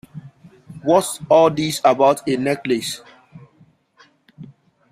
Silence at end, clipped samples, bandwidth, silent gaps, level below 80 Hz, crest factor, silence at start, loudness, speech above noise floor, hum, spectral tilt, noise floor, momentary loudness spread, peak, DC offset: 0.45 s; under 0.1%; 15.5 kHz; none; -60 dBFS; 18 dB; 0.15 s; -18 LUFS; 38 dB; none; -4.5 dB/octave; -55 dBFS; 16 LU; -2 dBFS; under 0.1%